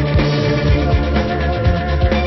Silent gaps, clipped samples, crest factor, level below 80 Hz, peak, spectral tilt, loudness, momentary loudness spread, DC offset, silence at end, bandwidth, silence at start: none; under 0.1%; 12 dB; -20 dBFS; -2 dBFS; -7.5 dB/octave; -16 LUFS; 2 LU; under 0.1%; 0 s; 6 kHz; 0 s